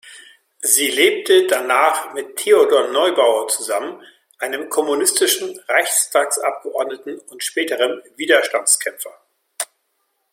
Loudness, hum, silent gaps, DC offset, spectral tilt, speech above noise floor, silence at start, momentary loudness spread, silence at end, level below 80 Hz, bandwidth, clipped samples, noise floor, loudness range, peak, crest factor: -17 LUFS; none; none; under 0.1%; 0.5 dB/octave; 52 dB; 0.05 s; 14 LU; 0.7 s; -74 dBFS; 16.5 kHz; under 0.1%; -69 dBFS; 5 LU; 0 dBFS; 18 dB